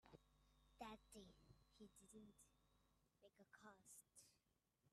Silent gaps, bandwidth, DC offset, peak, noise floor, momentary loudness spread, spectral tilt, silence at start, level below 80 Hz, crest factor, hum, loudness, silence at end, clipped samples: none; 13 kHz; under 0.1%; -44 dBFS; -88 dBFS; 8 LU; -3.5 dB/octave; 0 s; -82 dBFS; 24 dB; none; -65 LUFS; 0 s; under 0.1%